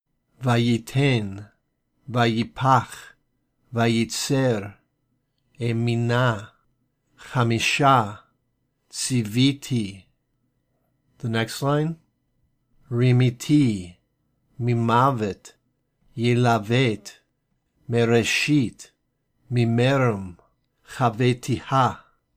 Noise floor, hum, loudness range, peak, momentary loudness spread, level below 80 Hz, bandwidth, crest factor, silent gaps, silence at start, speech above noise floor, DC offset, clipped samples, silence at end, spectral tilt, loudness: -72 dBFS; none; 4 LU; -4 dBFS; 15 LU; -58 dBFS; 15.5 kHz; 18 dB; none; 0.4 s; 51 dB; under 0.1%; under 0.1%; 0.4 s; -5.5 dB/octave; -22 LUFS